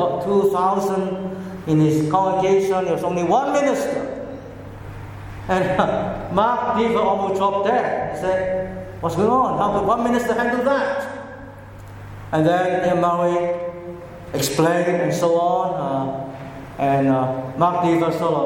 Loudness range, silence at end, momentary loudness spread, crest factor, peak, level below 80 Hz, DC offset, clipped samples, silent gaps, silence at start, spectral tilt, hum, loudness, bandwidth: 3 LU; 0 s; 17 LU; 18 dB; -2 dBFS; -46 dBFS; under 0.1%; under 0.1%; none; 0 s; -6 dB/octave; none; -20 LUFS; 17.5 kHz